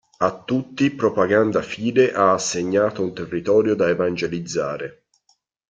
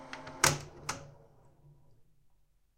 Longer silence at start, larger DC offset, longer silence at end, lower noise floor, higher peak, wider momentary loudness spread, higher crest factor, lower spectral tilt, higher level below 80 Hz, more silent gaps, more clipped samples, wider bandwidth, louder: first, 0.2 s vs 0 s; neither; about the same, 0.8 s vs 0.75 s; about the same, -65 dBFS vs -67 dBFS; first, -4 dBFS vs -10 dBFS; second, 8 LU vs 17 LU; second, 18 dB vs 30 dB; first, -5 dB/octave vs -2 dB/octave; about the same, -58 dBFS vs -62 dBFS; neither; neither; second, 9.2 kHz vs 16.5 kHz; first, -20 LUFS vs -32 LUFS